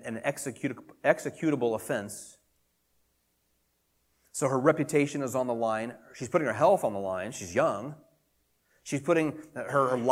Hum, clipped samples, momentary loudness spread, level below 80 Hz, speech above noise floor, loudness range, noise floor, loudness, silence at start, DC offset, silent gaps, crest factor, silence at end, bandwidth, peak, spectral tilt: none; under 0.1%; 15 LU; -72 dBFS; 45 dB; 5 LU; -74 dBFS; -29 LUFS; 0 s; under 0.1%; none; 22 dB; 0 s; 16.5 kHz; -8 dBFS; -5.5 dB/octave